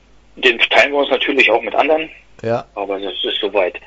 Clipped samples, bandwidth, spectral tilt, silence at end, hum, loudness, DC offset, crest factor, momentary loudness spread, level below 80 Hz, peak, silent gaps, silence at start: under 0.1%; 11 kHz; -4 dB/octave; 0.1 s; none; -15 LUFS; under 0.1%; 16 dB; 11 LU; -52 dBFS; 0 dBFS; none; 0.35 s